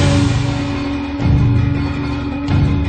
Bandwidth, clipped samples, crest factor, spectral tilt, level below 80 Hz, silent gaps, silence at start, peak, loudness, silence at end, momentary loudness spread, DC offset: 9.4 kHz; under 0.1%; 12 dB; -7 dB/octave; -24 dBFS; none; 0 s; -4 dBFS; -17 LUFS; 0 s; 7 LU; under 0.1%